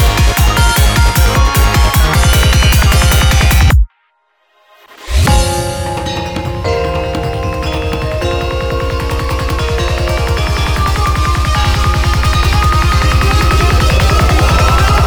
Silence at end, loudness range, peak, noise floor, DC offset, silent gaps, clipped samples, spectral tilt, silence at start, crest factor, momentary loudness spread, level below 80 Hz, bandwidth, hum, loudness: 0 s; 7 LU; 0 dBFS; -58 dBFS; 0.3%; none; under 0.1%; -4.5 dB/octave; 0 s; 10 dB; 8 LU; -14 dBFS; 19.5 kHz; none; -12 LUFS